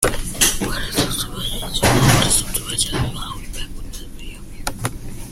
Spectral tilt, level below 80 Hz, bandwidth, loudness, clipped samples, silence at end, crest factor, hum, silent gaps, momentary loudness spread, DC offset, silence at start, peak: -3 dB/octave; -30 dBFS; 16.5 kHz; -19 LUFS; under 0.1%; 0 s; 20 dB; none; none; 20 LU; under 0.1%; 0 s; 0 dBFS